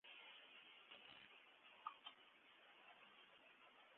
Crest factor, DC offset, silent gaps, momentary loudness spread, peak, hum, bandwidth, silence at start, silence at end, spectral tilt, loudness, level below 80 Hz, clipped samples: 28 dB; under 0.1%; none; 10 LU; -36 dBFS; none; 4 kHz; 0.05 s; 0 s; 2 dB/octave; -63 LUFS; under -90 dBFS; under 0.1%